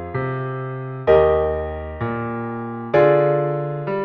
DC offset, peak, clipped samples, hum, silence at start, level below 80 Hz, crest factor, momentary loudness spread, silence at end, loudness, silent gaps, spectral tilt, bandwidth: under 0.1%; -2 dBFS; under 0.1%; none; 0 s; -40 dBFS; 16 dB; 13 LU; 0 s; -20 LUFS; none; -10 dB/octave; 5.4 kHz